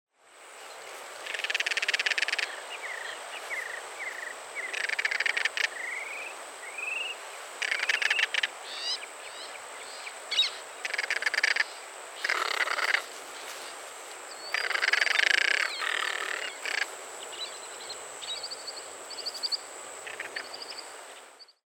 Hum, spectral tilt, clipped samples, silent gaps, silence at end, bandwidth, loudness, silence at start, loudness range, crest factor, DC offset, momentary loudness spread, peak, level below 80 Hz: none; 2.5 dB/octave; under 0.1%; none; 0.2 s; over 20 kHz; -30 LUFS; 0.25 s; 8 LU; 28 dB; under 0.1%; 15 LU; -4 dBFS; -90 dBFS